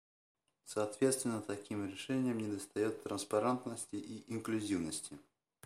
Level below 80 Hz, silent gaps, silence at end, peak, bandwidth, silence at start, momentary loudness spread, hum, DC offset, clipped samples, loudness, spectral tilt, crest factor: -76 dBFS; none; 0.45 s; -20 dBFS; 15.5 kHz; 0.65 s; 10 LU; none; under 0.1%; under 0.1%; -38 LUFS; -4.5 dB/octave; 20 dB